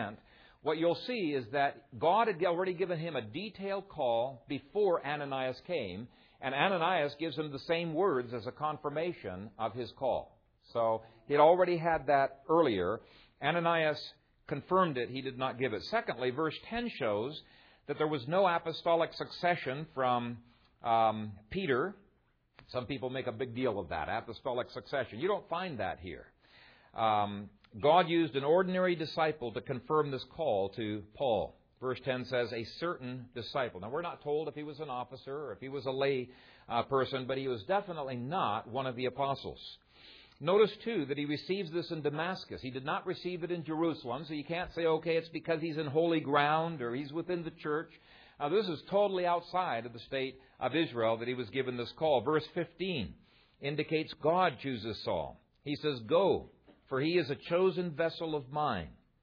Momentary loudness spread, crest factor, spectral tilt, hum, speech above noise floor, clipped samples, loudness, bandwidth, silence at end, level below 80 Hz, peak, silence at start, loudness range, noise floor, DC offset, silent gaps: 12 LU; 22 dB; -4 dB/octave; none; 39 dB; under 0.1%; -34 LUFS; 5.4 kHz; 0.3 s; -66 dBFS; -12 dBFS; 0 s; 6 LU; -72 dBFS; under 0.1%; none